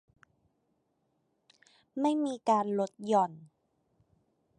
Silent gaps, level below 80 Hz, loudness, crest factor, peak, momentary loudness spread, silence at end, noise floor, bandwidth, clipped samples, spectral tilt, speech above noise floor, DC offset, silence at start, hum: none; -82 dBFS; -30 LUFS; 20 dB; -14 dBFS; 6 LU; 1.15 s; -77 dBFS; 10.5 kHz; under 0.1%; -6.5 dB/octave; 47 dB; under 0.1%; 1.95 s; none